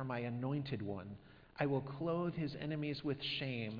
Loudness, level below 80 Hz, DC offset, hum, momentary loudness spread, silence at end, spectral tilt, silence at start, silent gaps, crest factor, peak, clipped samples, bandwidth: -40 LUFS; -68 dBFS; under 0.1%; none; 9 LU; 0 s; -5 dB/octave; 0 s; none; 20 dB; -20 dBFS; under 0.1%; 5.2 kHz